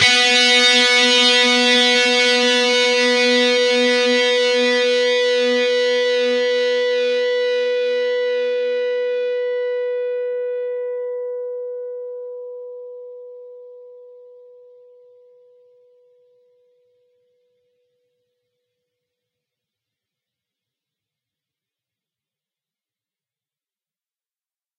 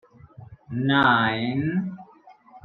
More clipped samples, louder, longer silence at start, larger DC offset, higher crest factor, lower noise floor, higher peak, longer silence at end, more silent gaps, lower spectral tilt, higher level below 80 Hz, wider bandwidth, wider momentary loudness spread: neither; first, -16 LUFS vs -22 LUFS; second, 0 s vs 0.4 s; neither; about the same, 18 dB vs 20 dB; first, under -90 dBFS vs -52 dBFS; first, -2 dBFS vs -6 dBFS; first, 10.65 s vs 0.05 s; neither; second, -0.5 dB/octave vs -8.5 dB/octave; second, -78 dBFS vs -60 dBFS; first, 11.5 kHz vs 4.9 kHz; first, 19 LU vs 16 LU